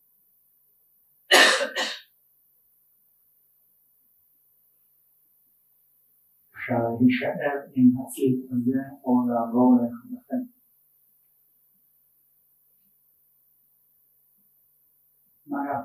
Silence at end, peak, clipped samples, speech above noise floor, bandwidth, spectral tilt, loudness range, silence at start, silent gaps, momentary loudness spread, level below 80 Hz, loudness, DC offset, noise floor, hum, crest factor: 0 s; -2 dBFS; under 0.1%; 41 dB; 15.5 kHz; -4 dB/octave; 16 LU; 1.3 s; none; 15 LU; -72 dBFS; -23 LUFS; under 0.1%; -64 dBFS; none; 26 dB